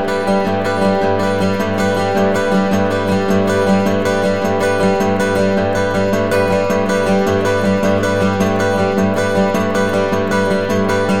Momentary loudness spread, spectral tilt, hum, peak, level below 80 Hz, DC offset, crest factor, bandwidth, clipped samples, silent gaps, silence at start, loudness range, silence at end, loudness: 1 LU; -6 dB/octave; none; -4 dBFS; -44 dBFS; 3%; 12 dB; 16 kHz; under 0.1%; none; 0 s; 0 LU; 0 s; -15 LUFS